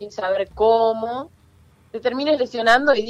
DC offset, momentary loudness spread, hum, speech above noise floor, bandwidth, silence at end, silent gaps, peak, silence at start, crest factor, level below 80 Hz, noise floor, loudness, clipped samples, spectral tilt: under 0.1%; 14 LU; none; 34 dB; 10.5 kHz; 0 s; none; -2 dBFS; 0 s; 18 dB; -52 dBFS; -53 dBFS; -20 LUFS; under 0.1%; -4 dB/octave